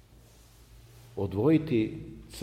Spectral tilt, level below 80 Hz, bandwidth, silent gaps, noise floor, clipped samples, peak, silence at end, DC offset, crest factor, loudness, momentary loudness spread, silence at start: -8 dB/octave; -54 dBFS; 15 kHz; none; -56 dBFS; under 0.1%; -12 dBFS; 0 s; under 0.1%; 18 dB; -28 LUFS; 19 LU; 0.75 s